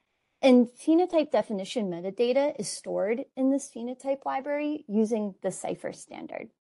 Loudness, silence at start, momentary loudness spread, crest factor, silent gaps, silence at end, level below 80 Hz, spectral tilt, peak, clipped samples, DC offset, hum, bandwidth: -27 LUFS; 0.4 s; 14 LU; 18 dB; none; 0.15 s; -76 dBFS; -5 dB/octave; -8 dBFS; under 0.1%; under 0.1%; none; 11.5 kHz